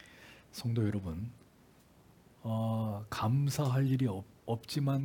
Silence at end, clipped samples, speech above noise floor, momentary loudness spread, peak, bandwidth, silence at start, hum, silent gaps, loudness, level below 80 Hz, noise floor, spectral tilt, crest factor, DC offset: 0 s; under 0.1%; 30 dB; 15 LU; -20 dBFS; 18 kHz; 0 s; none; none; -34 LUFS; -64 dBFS; -62 dBFS; -7 dB/octave; 14 dB; under 0.1%